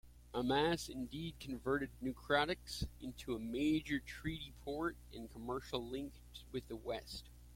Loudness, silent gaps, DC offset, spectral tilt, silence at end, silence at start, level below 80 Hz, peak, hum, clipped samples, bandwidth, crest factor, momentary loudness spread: -41 LUFS; none; under 0.1%; -5 dB/octave; 0 s; 0.05 s; -56 dBFS; -20 dBFS; none; under 0.1%; 16.5 kHz; 20 dB; 13 LU